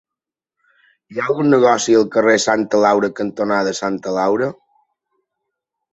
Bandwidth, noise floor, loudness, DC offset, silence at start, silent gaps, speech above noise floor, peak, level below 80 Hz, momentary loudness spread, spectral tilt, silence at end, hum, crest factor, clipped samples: 8.2 kHz; -87 dBFS; -16 LUFS; under 0.1%; 1.1 s; none; 71 dB; -2 dBFS; -60 dBFS; 9 LU; -4.5 dB/octave; 1.4 s; none; 16 dB; under 0.1%